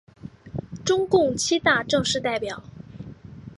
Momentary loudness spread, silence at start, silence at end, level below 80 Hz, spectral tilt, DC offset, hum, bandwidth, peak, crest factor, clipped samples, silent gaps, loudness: 21 LU; 0.25 s; 0.05 s; -52 dBFS; -3.5 dB/octave; under 0.1%; none; 11.5 kHz; -6 dBFS; 20 dB; under 0.1%; none; -22 LUFS